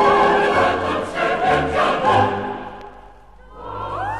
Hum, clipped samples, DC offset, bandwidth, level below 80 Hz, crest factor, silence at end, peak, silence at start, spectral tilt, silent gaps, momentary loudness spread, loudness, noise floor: none; under 0.1%; 0.4%; 12 kHz; -42 dBFS; 14 dB; 0 s; -4 dBFS; 0 s; -5.5 dB/octave; none; 18 LU; -18 LUFS; -44 dBFS